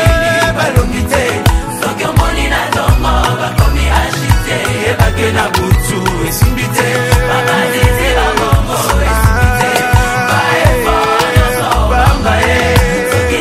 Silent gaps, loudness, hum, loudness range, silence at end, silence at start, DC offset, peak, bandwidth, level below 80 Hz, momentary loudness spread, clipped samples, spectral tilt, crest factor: none; -11 LUFS; none; 2 LU; 0 s; 0 s; 0.1%; 0 dBFS; 16 kHz; -16 dBFS; 3 LU; 0.3%; -4.5 dB/octave; 10 dB